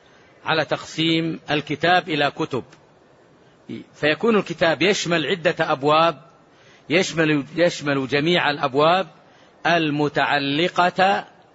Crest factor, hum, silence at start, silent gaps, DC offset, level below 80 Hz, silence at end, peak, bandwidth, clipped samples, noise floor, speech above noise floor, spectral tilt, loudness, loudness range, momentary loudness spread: 18 dB; none; 0.45 s; none; under 0.1%; -62 dBFS; 0.3 s; -4 dBFS; 8 kHz; under 0.1%; -53 dBFS; 33 dB; -4.5 dB/octave; -20 LUFS; 3 LU; 8 LU